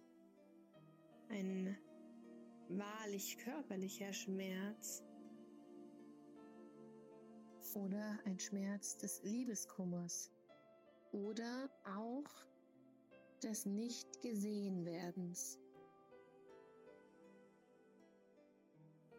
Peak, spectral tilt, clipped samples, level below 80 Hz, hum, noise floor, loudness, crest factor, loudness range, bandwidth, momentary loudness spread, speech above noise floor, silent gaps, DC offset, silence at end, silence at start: -34 dBFS; -4.5 dB/octave; under 0.1%; under -90 dBFS; none; -70 dBFS; -47 LUFS; 16 dB; 8 LU; 16 kHz; 22 LU; 24 dB; none; under 0.1%; 0 s; 0 s